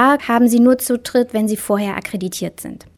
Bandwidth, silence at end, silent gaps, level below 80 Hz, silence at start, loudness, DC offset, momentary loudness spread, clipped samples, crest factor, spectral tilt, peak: 18 kHz; 0.2 s; none; -54 dBFS; 0 s; -17 LUFS; under 0.1%; 13 LU; under 0.1%; 16 dB; -5 dB/octave; 0 dBFS